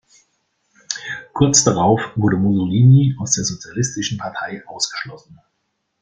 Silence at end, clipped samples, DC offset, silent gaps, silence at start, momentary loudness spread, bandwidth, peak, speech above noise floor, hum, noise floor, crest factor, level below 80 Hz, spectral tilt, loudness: 0.7 s; under 0.1%; under 0.1%; none; 0.9 s; 16 LU; 9.4 kHz; 0 dBFS; 55 dB; none; -72 dBFS; 18 dB; -50 dBFS; -4.5 dB/octave; -17 LUFS